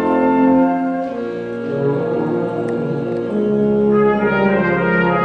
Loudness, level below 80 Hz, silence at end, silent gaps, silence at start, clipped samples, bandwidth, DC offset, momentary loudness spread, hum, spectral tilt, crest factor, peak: -17 LUFS; -46 dBFS; 0 s; none; 0 s; under 0.1%; 6 kHz; under 0.1%; 8 LU; none; -9 dB/octave; 12 dB; -4 dBFS